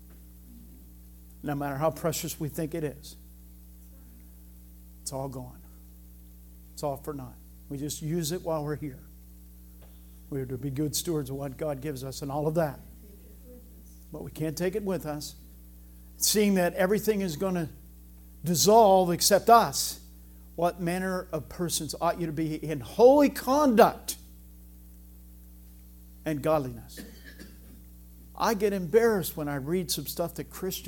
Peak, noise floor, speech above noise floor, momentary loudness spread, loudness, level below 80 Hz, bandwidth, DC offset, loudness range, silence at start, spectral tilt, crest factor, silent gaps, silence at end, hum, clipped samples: -4 dBFS; -49 dBFS; 22 dB; 21 LU; -27 LUFS; -50 dBFS; 17.5 kHz; under 0.1%; 15 LU; 0 s; -4.5 dB/octave; 24 dB; none; 0 s; 60 Hz at -50 dBFS; under 0.1%